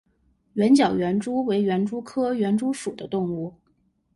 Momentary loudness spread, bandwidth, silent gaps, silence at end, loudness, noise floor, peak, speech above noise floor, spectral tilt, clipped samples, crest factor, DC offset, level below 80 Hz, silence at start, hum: 12 LU; 11.5 kHz; none; 0.65 s; -24 LUFS; -67 dBFS; -8 dBFS; 44 dB; -6.5 dB/octave; under 0.1%; 16 dB; under 0.1%; -60 dBFS; 0.55 s; none